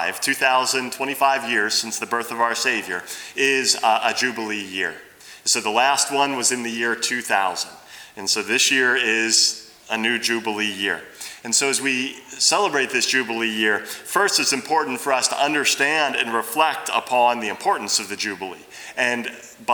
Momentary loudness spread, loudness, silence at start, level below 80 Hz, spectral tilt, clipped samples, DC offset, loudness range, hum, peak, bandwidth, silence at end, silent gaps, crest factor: 11 LU; -20 LUFS; 0 s; -70 dBFS; -0.5 dB/octave; under 0.1%; under 0.1%; 2 LU; none; -4 dBFS; over 20 kHz; 0 s; none; 18 dB